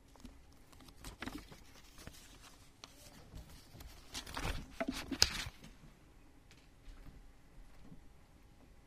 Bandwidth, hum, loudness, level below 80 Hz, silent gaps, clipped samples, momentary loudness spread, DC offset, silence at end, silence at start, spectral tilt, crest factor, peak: 15.5 kHz; none; -39 LUFS; -54 dBFS; none; under 0.1%; 22 LU; under 0.1%; 0 s; 0 s; -2.5 dB/octave; 40 dB; -6 dBFS